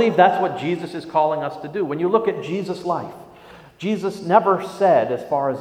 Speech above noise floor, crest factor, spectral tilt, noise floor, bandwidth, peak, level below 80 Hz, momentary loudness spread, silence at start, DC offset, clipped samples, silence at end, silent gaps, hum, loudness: 25 dB; 20 dB; -6.5 dB/octave; -44 dBFS; 15 kHz; 0 dBFS; -62 dBFS; 10 LU; 0 s; under 0.1%; under 0.1%; 0 s; none; none; -21 LUFS